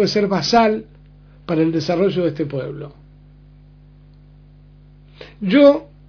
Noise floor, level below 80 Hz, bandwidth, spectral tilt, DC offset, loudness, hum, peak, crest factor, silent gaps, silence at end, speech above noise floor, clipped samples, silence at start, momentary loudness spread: -45 dBFS; -48 dBFS; 5.4 kHz; -6 dB/octave; under 0.1%; -17 LUFS; 50 Hz at -45 dBFS; 0 dBFS; 20 dB; none; 0.25 s; 29 dB; under 0.1%; 0 s; 18 LU